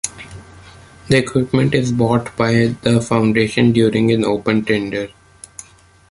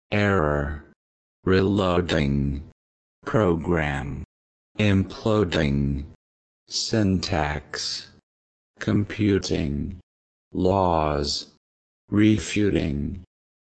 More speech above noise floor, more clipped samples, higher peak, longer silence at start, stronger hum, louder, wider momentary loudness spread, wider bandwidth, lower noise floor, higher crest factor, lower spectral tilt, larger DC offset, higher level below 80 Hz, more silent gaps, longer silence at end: second, 32 dB vs over 67 dB; neither; first, 0 dBFS vs -6 dBFS; about the same, 0.05 s vs 0.1 s; neither; first, -16 LUFS vs -24 LUFS; first, 21 LU vs 13 LU; first, 11.5 kHz vs 9 kHz; second, -47 dBFS vs under -90 dBFS; about the same, 16 dB vs 18 dB; about the same, -6 dB/octave vs -6 dB/octave; neither; second, -46 dBFS vs -38 dBFS; second, none vs 0.96-1.43 s, 2.72-3.22 s, 4.25-4.75 s, 6.15-6.66 s, 8.23-8.74 s, 10.03-10.51 s, 11.57-12.08 s; about the same, 0.5 s vs 0.5 s